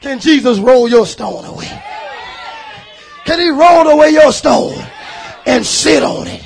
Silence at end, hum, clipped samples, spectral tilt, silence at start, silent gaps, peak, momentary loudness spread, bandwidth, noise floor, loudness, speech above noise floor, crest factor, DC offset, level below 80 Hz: 0 s; none; 0.6%; -3.5 dB/octave; 0 s; none; 0 dBFS; 21 LU; 10.5 kHz; -34 dBFS; -9 LUFS; 25 dB; 12 dB; under 0.1%; -42 dBFS